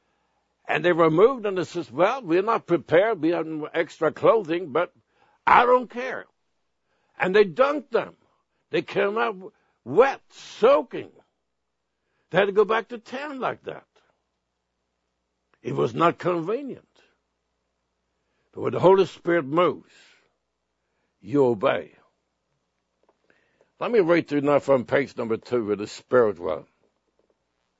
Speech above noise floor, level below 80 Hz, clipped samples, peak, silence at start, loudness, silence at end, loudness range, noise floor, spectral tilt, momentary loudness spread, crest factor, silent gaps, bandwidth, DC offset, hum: 57 dB; -66 dBFS; under 0.1%; -2 dBFS; 0.7 s; -23 LUFS; 1.2 s; 6 LU; -80 dBFS; -6.5 dB/octave; 14 LU; 24 dB; none; 8 kHz; under 0.1%; none